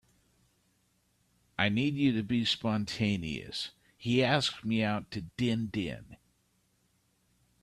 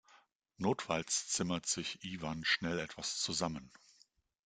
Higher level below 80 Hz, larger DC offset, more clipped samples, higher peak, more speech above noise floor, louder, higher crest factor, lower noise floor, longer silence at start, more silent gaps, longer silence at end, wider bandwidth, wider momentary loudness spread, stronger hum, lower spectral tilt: first, -62 dBFS vs -68 dBFS; neither; neither; first, -12 dBFS vs -18 dBFS; first, 42 dB vs 33 dB; first, -31 LUFS vs -36 LUFS; about the same, 22 dB vs 22 dB; about the same, -73 dBFS vs -71 dBFS; first, 1.6 s vs 0.6 s; neither; first, 1.5 s vs 0.75 s; first, 13 kHz vs 10 kHz; first, 12 LU vs 8 LU; first, 60 Hz at -55 dBFS vs none; first, -5.5 dB/octave vs -2.5 dB/octave